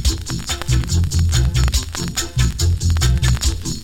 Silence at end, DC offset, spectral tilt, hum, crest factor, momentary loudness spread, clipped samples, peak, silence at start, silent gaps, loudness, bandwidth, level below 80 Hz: 0 s; under 0.1%; -4 dB/octave; none; 14 dB; 6 LU; under 0.1%; -2 dBFS; 0 s; none; -19 LUFS; 16.5 kHz; -20 dBFS